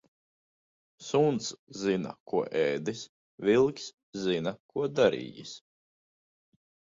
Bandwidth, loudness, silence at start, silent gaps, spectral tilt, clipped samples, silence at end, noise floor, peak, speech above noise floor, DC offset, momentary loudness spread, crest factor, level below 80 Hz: 7.8 kHz; -29 LUFS; 1 s; 1.59-1.67 s, 2.20-2.26 s, 3.09-3.38 s, 3.94-4.13 s, 4.60-4.69 s; -5 dB/octave; under 0.1%; 1.35 s; under -90 dBFS; -8 dBFS; over 61 dB; under 0.1%; 17 LU; 22 dB; -68 dBFS